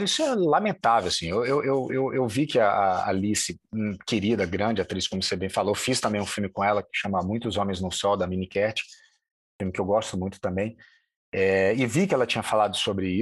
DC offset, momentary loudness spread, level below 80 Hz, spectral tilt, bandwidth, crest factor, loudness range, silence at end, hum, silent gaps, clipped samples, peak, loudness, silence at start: under 0.1%; 8 LU; -50 dBFS; -4.5 dB/octave; 12.5 kHz; 16 dB; 4 LU; 0 s; none; 9.31-9.59 s, 11.16-11.32 s; under 0.1%; -10 dBFS; -25 LUFS; 0 s